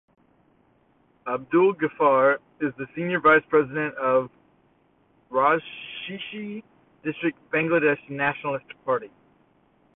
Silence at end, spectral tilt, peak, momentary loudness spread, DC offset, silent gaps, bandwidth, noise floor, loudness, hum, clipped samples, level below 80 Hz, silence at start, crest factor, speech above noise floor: 0.9 s; -10 dB/octave; -6 dBFS; 15 LU; under 0.1%; none; 4 kHz; -63 dBFS; -24 LUFS; none; under 0.1%; -66 dBFS; 1.25 s; 20 dB; 40 dB